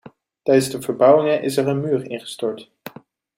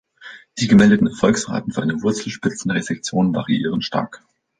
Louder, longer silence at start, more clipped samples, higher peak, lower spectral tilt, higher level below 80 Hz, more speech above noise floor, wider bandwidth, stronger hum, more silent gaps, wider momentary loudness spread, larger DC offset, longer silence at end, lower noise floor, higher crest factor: about the same, -19 LUFS vs -19 LUFS; second, 0.05 s vs 0.2 s; neither; about the same, -2 dBFS vs -2 dBFS; about the same, -5.5 dB/octave vs -5.5 dB/octave; second, -64 dBFS vs -50 dBFS; about the same, 26 dB vs 24 dB; first, 16 kHz vs 9.6 kHz; neither; neither; first, 21 LU vs 12 LU; neither; about the same, 0.5 s vs 0.45 s; about the same, -44 dBFS vs -42 dBFS; about the same, 18 dB vs 16 dB